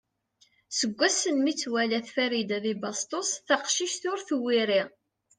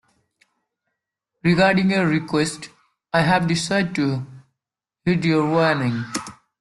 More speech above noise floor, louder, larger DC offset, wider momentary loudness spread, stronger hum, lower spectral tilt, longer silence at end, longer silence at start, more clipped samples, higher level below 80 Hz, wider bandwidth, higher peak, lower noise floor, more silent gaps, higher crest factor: second, 39 dB vs 67 dB; second, -27 LUFS vs -20 LUFS; neither; second, 7 LU vs 13 LU; neither; second, -2 dB/octave vs -5.5 dB/octave; first, 0.5 s vs 0.25 s; second, 0.7 s vs 1.45 s; neither; second, -78 dBFS vs -56 dBFS; second, 10.5 kHz vs 12 kHz; second, -10 dBFS vs -4 dBFS; second, -67 dBFS vs -86 dBFS; neither; about the same, 20 dB vs 18 dB